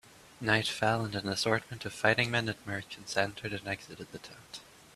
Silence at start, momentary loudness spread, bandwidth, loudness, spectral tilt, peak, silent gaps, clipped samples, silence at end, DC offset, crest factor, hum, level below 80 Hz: 0.15 s; 18 LU; 14.5 kHz; -31 LUFS; -4 dB/octave; -8 dBFS; none; under 0.1%; 0.3 s; under 0.1%; 24 dB; none; -64 dBFS